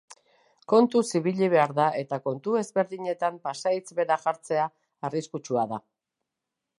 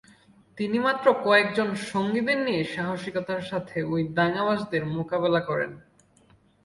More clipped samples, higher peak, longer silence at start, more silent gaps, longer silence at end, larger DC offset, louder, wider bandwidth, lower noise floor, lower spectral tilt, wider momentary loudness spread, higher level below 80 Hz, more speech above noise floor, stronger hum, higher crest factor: neither; about the same, -6 dBFS vs -6 dBFS; second, 0.1 s vs 0.55 s; neither; first, 1 s vs 0.85 s; neither; about the same, -26 LUFS vs -25 LUFS; about the same, 11.5 kHz vs 11.5 kHz; first, -86 dBFS vs -60 dBFS; about the same, -5.5 dB/octave vs -6 dB/octave; about the same, 10 LU vs 10 LU; second, -78 dBFS vs -62 dBFS; first, 60 dB vs 34 dB; neither; about the same, 22 dB vs 20 dB